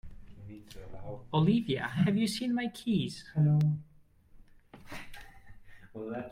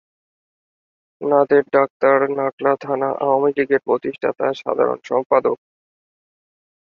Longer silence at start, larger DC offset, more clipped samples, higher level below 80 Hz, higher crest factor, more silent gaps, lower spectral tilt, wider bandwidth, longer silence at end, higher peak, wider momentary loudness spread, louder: second, 0.05 s vs 1.2 s; neither; neither; first, -56 dBFS vs -66 dBFS; about the same, 18 dB vs 18 dB; second, none vs 1.90-2.00 s, 2.53-2.58 s, 5.26-5.30 s; about the same, -7 dB/octave vs -7.5 dB/octave; first, 13 kHz vs 6.8 kHz; second, 0 s vs 1.3 s; second, -16 dBFS vs -2 dBFS; first, 23 LU vs 7 LU; second, -30 LUFS vs -19 LUFS